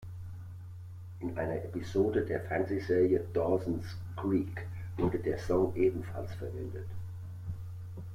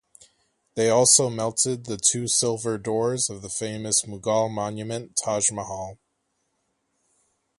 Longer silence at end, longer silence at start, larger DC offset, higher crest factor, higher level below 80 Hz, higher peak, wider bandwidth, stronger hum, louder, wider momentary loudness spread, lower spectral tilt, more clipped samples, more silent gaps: second, 0 s vs 1.65 s; second, 0 s vs 0.75 s; neither; second, 16 dB vs 22 dB; first, -54 dBFS vs -60 dBFS; second, -16 dBFS vs -4 dBFS; first, 15 kHz vs 12 kHz; neither; second, -33 LUFS vs -23 LUFS; about the same, 16 LU vs 14 LU; first, -8.5 dB/octave vs -3 dB/octave; neither; neither